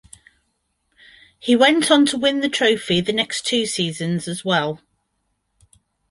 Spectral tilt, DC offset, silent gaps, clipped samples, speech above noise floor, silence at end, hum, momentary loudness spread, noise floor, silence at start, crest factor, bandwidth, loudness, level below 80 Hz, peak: -4 dB/octave; under 0.1%; none; under 0.1%; 53 dB; 1.35 s; none; 10 LU; -72 dBFS; 1.45 s; 20 dB; 11.5 kHz; -18 LUFS; -58 dBFS; -2 dBFS